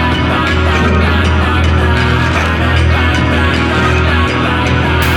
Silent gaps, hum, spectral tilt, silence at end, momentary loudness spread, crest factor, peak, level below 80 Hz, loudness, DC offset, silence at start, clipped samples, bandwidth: none; none; -6 dB/octave; 0 s; 1 LU; 10 dB; 0 dBFS; -22 dBFS; -11 LUFS; under 0.1%; 0 s; under 0.1%; 18.5 kHz